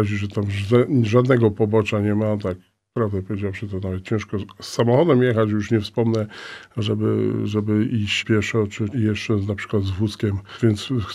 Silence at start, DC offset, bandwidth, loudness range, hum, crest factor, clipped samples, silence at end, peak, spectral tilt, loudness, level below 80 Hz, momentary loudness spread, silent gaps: 0 s; under 0.1%; 11.5 kHz; 2 LU; none; 18 dB; under 0.1%; 0 s; -2 dBFS; -7 dB/octave; -21 LUFS; -54 dBFS; 10 LU; none